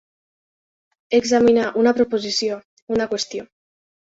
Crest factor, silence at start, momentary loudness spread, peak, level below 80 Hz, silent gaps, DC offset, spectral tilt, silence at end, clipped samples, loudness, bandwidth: 16 dB; 1.1 s; 12 LU; -4 dBFS; -58 dBFS; 2.65-2.87 s; under 0.1%; -3.5 dB/octave; 0.6 s; under 0.1%; -19 LUFS; 7.8 kHz